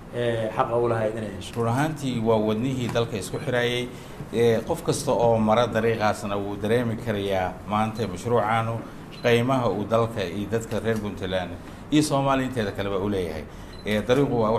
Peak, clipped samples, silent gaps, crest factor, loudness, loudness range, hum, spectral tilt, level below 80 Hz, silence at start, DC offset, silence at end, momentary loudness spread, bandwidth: -8 dBFS; under 0.1%; none; 18 dB; -25 LUFS; 2 LU; none; -6 dB/octave; -46 dBFS; 0 s; under 0.1%; 0 s; 9 LU; 15 kHz